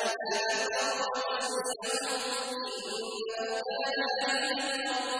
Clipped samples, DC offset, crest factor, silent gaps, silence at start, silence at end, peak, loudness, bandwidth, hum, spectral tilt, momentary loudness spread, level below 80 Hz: under 0.1%; under 0.1%; 14 dB; none; 0 s; 0 s; -18 dBFS; -31 LUFS; 11 kHz; none; 0 dB/octave; 6 LU; -76 dBFS